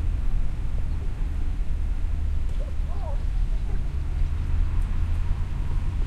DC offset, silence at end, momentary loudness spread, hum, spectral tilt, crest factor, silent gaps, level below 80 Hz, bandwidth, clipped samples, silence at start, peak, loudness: under 0.1%; 0 s; 3 LU; none; -7.5 dB/octave; 12 dB; none; -24 dBFS; 5.2 kHz; under 0.1%; 0 s; -12 dBFS; -30 LUFS